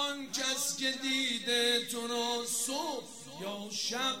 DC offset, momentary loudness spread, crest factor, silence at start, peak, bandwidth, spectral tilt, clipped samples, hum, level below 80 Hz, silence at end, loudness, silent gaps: 0.1%; 12 LU; 18 dB; 0 s; -16 dBFS; 16 kHz; -0.5 dB/octave; under 0.1%; none; -80 dBFS; 0 s; -32 LUFS; none